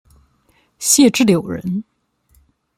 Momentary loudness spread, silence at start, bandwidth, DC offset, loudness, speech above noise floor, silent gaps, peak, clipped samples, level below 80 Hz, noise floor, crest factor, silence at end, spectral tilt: 13 LU; 0.8 s; 16 kHz; under 0.1%; -15 LUFS; 45 dB; none; 0 dBFS; under 0.1%; -54 dBFS; -59 dBFS; 18 dB; 0.95 s; -3.5 dB/octave